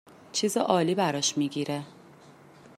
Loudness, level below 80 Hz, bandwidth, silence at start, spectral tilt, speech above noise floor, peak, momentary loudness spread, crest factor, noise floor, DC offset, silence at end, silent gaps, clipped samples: -27 LUFS; -74 dBFS; 16 kHz; 0.35 s; -4 dB/octave; 26 dB; -8 dBFS; 9 LU; 20 dB; -53 dBFS; under 0.1%; 0.45 s; none; under 0.1%